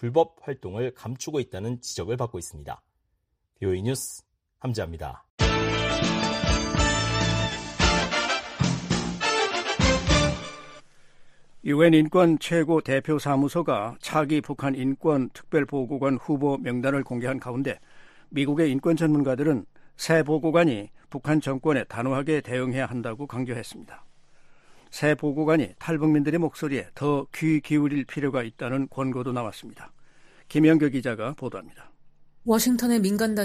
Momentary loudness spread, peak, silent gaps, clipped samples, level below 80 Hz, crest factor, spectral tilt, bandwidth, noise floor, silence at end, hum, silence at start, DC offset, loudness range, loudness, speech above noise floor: 13 LU; -6 dBFS; 5.30-5.38 s; under 0.1%; -40 dBFS; 20 dB; -5.5 dB/octave; 15 kHz; -74 dBFS; 0 s; none; 0 s; under 0.1%; 7 LU; -25 LUFS; 50 dB